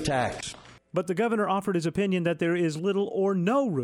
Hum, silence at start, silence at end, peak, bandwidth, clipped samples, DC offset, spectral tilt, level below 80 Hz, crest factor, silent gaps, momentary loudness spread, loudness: none; 0 s; 0 s; -12 dBFS; 13 kHz; under 0.1%; under 0.1%; -6 dB/octave; -56 dBFS; 14 dB; none; 8 LU; -27 LUFS